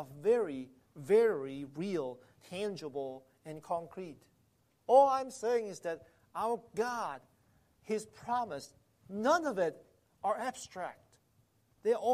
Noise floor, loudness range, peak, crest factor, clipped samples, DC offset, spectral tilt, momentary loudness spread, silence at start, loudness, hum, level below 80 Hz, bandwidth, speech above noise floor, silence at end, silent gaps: -72 dBFS; 6 LU; -14 dBFS; 22 dB; under 0.1%; under 0.1%; -5 dB/octave; 19 LU; 0 s; -34 LUFS; none; -76 dBFS; 15 kHz; 39 dB; 0 s; none